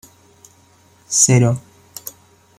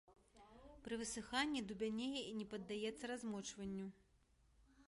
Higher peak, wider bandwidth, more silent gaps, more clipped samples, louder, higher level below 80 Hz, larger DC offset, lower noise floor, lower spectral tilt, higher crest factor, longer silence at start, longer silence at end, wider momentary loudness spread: first, 0 dBFS vs -26 dBFS; first, 16 kHz vs 11.5 kHz; neither; neither; first, -14 LUFS vs -46 LUFS; first, -56 dBFS vs -70 dBFS; neither; second, -52 dBFS vs -75 dBFS; about the same, -4 dB/octave vs -3.5 dB/octave; about the same, 20 dB vs 22 dB; first, 1.1 s vs 0.1 s; first, 0.5 s vs 0.05 s; first, 23 LU vs 15 LU